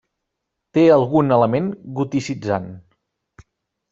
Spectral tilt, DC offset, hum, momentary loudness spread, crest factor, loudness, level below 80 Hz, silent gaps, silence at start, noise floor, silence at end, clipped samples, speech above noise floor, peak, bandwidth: -7.5 dB/octave; under 0.1%; none; 12 LU; 18 dB; -18 LUFS; -58 dBFS; none; 0.75 s; -79 dBFS; 1.1 s; under 0.1%; 61 dB; -2 dBFS; 7.8 kHz